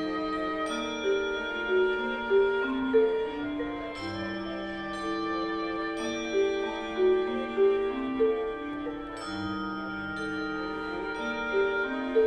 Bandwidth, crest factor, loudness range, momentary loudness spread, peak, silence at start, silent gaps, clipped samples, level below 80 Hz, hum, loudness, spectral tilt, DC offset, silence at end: 9.2 kHz; 16 dB; 5 LU; 9 LU; -14 dBFS; 0 s; none; under 0.1%; -54 dBFS; none; -30 LUFS; -5 dB/octave; under 0.1%; 0 s